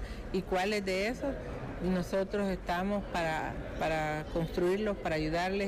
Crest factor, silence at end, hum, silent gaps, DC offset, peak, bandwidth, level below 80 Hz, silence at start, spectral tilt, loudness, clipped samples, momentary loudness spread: 10 dB; 0 s; none; none; under 0.1%; -22 dBFS; 15.5 kHz; -46 dBFS; 0 s; -6 dB/octave; -33 LUFS; under 0.1%; 6 LU